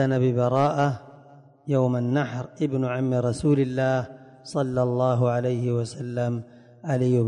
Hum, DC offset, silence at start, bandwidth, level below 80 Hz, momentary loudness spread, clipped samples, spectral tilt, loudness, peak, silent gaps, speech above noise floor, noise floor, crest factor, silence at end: none; under 0.1%; 0 s; 10.5 kHz; -58 dBFS; 10 LU; under 0.1%; -8 dB/octave; -25 LUFS; -10 dBFS; none; 27 dB; -51 dBFS; 14 dB; 0 s